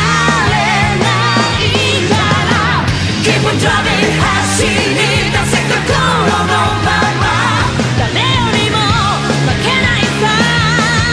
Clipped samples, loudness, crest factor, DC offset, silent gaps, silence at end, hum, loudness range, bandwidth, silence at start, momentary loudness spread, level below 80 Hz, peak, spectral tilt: under 0.1%; -11 LUFS; 12 dB; under 0.1%; none; 0 s; none; 1 LU; 11 kHz; 0 s; 2 LU; -30 dBFS; 0 dBFS; -4 dB/octave